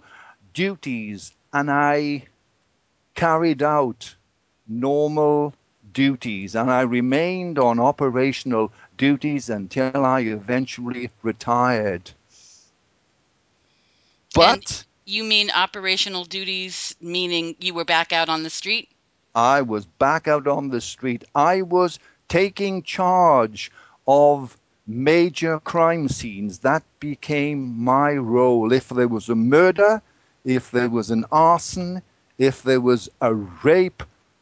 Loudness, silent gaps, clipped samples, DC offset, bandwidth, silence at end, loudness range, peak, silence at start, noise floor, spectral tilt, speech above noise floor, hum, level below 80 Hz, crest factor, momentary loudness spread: -20 LUFS; none; under 0.1%; under 0.1%; 8 kHz; 0.35 s; 4 LU; 0 dBFS; 0.55 s; -67 dBFS; -5 dB/octave; 47 dB; none; -54 dBFS; 20 dB; 12 LU